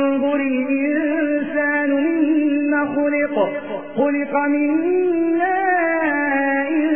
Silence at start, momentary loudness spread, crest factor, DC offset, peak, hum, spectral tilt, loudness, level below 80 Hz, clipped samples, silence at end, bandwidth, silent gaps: 0 s; 3 LU; 12 dB; 0.6%; -6 dBFS; none; -9.5 dB/octave; -19 LUFS; -66 dBFS; under 0.1%; 0 s; 3.4 kHz; none